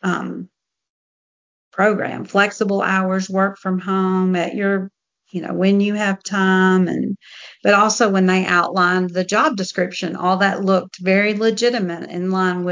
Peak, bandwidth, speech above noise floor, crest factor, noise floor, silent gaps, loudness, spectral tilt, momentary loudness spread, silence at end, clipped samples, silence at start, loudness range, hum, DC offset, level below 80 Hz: -2 dBFS; 7.6 kHz; over 72 dB; 16 dB; under -90 dBFS; 0.89-1.71 s; -18 LUFS; -5.5 dB/octave; 10 LU; 0 s; under 0.1%; 0.05 s; 4 LU; none; under 0.1%; -68 dBFS